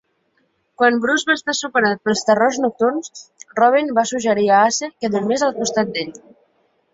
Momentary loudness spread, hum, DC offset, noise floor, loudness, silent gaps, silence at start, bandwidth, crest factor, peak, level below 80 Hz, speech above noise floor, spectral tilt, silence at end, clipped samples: 10 LU; none; under 0.1%; -65 dBFS; -18 LUFS; none; 0.8 s; 8 kHz; 16 dB; -2 dBFS; -64 dBFS; 47 dB; -3.5 dB/octave; 0.75 s; under 0.1%